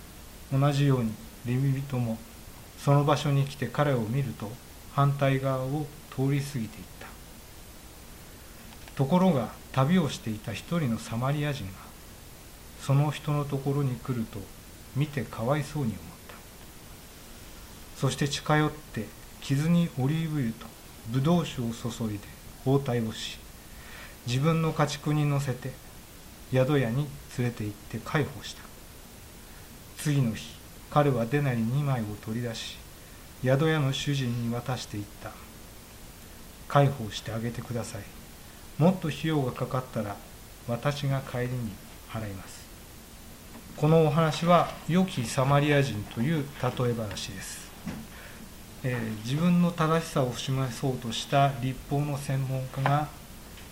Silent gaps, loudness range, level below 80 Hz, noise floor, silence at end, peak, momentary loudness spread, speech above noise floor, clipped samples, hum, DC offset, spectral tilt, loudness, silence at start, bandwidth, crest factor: none; 6 LU; -50 dBFS; -47 dBFS; 0 s; -6 dBFS; 22 LU; 20 dB; under 0.1%; none; under 0.1%; -6.5 dB/octave; -28 LUFS; 0 s; 16 kHz; 22 dB